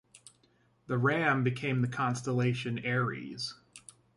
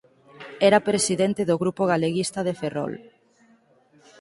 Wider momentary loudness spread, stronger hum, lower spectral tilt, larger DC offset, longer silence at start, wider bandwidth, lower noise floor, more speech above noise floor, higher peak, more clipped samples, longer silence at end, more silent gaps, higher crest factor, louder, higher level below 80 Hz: second, 12 LU vs 16 LU; neither; first, -6 dB/octave vs -4.5 dB/octave; neither; second, 0.15 s vs 0.4 s; about the same, 11.5 kHz vs 11.5 kHz; first, -68 dBFS vs -59 dBFS; about the same, 38 dB vs 37 dB; second, -14 dBFS vs -4 dBFS; neither; second, 0.4 s vs 1.2 s; neither; about the same, 18 dB vs 20 dB; second, -31 LUFS vs -23 LUFS; about the same, -68 dBFS vs -64 dBFS